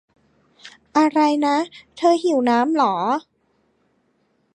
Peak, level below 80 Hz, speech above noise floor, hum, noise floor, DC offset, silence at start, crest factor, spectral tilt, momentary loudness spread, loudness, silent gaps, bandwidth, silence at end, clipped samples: -4 dBFS; -72 dBFS; 47 dB; none; -65 dBFS; under 0.1%; 0.65 s; 16 dB; -4.5 dB/octave; 6 LU; -19 LUFS; none; 10.5 kHz; 1.35 s; under 0.1%